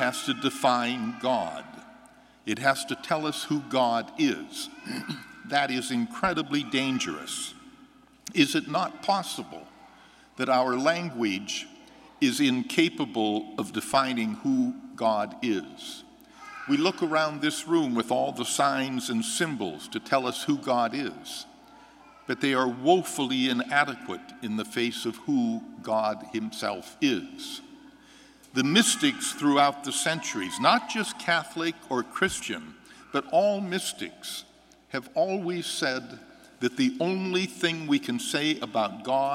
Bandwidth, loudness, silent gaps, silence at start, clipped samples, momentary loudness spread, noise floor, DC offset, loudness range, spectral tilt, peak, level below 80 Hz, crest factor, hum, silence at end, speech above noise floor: 16 kHz; -27 LUFS; none; 0 s; under 0.1%; 13 LU; -55 dBFS; under 0.1%; 4 LU; -3.5 dB/octave; -6 dBFS; -68 dBFS; 24 dB; none; 0 s; 28 dB